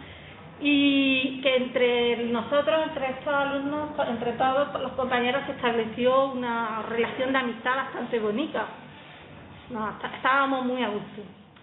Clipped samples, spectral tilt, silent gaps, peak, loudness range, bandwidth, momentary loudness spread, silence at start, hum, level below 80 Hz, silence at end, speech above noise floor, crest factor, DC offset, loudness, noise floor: under 0.1%; -9 dB/octave; none; -8 dBFS; 5 LU; 4.1 kHz; 18 LU; 0 s; none; -62 dBFS; 0.2 s; 20 dB; 18 dB; under 0.1%; -26 LUFS; -46 dBFS